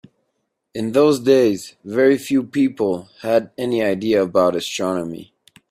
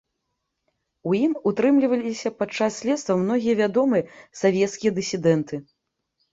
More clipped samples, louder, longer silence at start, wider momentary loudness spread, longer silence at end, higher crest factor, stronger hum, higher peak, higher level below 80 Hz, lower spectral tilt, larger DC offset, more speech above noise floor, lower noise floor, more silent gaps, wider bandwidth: neither; first, -19 LUFS vs -22 LUFS; second, 0.75 s vs 1.05 s; first, 11 LU vs 8 LU; second, 0.5 s vs 0.7 s; about the same, 18 dB vs 16 dB; neither; first, -2 dBFS vs -6 dBFS; first, -60 dBFS vs -66 dBFS; about the same, -5.5 dB/octave vs -6 dB/octave; neither; about the same, 55 dB vs 56 dB; second, -73 dBFS vs -78 dBFS; neither; first, 15.5 kHz vs 8 kHz